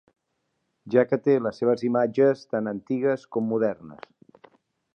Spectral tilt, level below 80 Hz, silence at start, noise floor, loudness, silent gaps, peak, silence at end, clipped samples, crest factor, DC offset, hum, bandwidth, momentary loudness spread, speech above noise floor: -8.5 dB/octave; -72 dBFS; 0.85 s; -77 dBFS; -24 LUFS; none; -6 dBFS; 1 s; under 0.1%; 20 dB; under 0.1%; none; 7 kHz; 8 LU; 53 dB